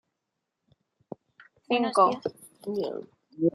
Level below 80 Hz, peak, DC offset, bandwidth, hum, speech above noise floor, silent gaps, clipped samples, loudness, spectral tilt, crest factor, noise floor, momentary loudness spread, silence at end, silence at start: -76 dBFS; -8 dBFS; under 0.1%; 12.5 kHz; none; 57 dB; none; under 0.1%; -27 LUFS; -5.5 dB/octave; 22 dB; -83 dBFS; 24 LU; 0.05 s; 1.7 s